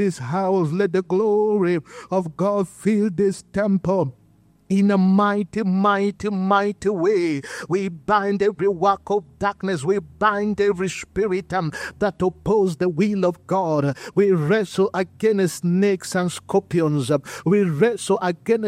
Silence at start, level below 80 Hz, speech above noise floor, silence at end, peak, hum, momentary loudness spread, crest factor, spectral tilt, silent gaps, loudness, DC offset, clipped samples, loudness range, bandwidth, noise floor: 0 s; -54 dBFS; 35 dB; 0 s; -4 dBFS; none; 6 LU; 16 dB; -6.5 dB/octave; none; -21 LUFS; under 0.1%; under 0.1%; 2 LU; 14 kHz; -56 dBFS